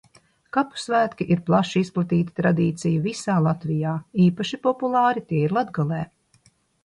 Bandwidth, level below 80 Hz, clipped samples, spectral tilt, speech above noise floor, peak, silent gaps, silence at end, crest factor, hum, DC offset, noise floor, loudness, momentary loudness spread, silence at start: 11 kHz; -60 dBFS; under 0.1%; -7 dB/octave; 39 dB; -6 dBFS; none; 0.8 s; 16 dB; none; under 0.1%; -61 dBFS; -23 LUFS; 5 LU; 0.55 s